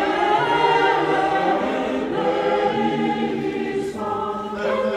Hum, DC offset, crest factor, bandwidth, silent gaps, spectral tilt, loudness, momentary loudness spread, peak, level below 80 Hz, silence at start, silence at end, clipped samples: none; under 0.1%; 14 dB; 12 kHz; none; -5.5 dB/octave; -21 LUFS; 8 LU; -6 dBFS; -52 dBFS; 0 s; 0 s; under 0.1%